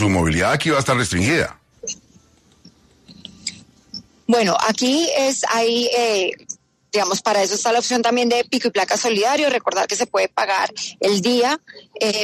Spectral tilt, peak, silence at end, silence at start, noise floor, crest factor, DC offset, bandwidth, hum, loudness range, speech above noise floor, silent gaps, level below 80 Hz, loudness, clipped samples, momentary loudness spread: -3.5 dB/octave; -6 dBFS; 0 s; 0 s; -53 dBFS; 14 dB; under 0.1%; 14 kHz; none; 6 LU; 35 dB; none; -50 dBFS; -18 LUFS; under 0.1%; 13 LU